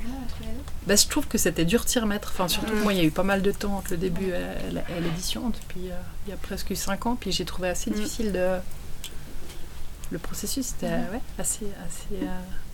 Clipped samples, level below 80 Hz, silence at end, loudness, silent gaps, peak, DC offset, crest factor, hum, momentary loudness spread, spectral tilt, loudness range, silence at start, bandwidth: under 0.1%; -36 dBFS; 0 s; -27 LUFS; none; -4 dBFS; under 0.1%; 22 dB; none; 16 LU; -3.5 dB/octave; 8 LU; 0 s; 18 kHz